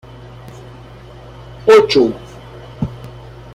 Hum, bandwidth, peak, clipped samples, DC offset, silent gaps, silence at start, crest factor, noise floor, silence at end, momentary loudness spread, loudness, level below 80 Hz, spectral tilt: none; 12.5 kHz; -2 dBFS; under 0.1%; under 0.1%; none; 1.65 s; 16 dB; -36 dBFS; 0.5 s; 27 LU; -13 LUFS; -42 dBFS; -5.5 dB/octave